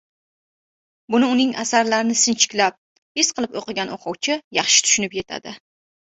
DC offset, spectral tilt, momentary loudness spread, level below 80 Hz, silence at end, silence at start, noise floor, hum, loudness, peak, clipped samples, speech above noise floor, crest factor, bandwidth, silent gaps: under 0.1%; -1 dB/octave; 13 LU; -64 dBFS; 0.55 s; 1.1 s; under -90 dBFS; none; -19 LUFS; 0 dBFS; under 0.1%; over 70 dB; 22 dB; 8.4 kHz; 2.78-3.15 s, 4.44-4.51 s